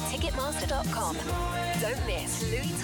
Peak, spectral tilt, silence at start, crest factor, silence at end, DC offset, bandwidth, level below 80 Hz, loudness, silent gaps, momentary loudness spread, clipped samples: -20 dBFS; -4 dB/octave; 0 s; 10 dB; 0 s; under 0.1%; 19.5 kHz; -38 dBFS; -30 LUFS; none; 1 LU; under 0.1%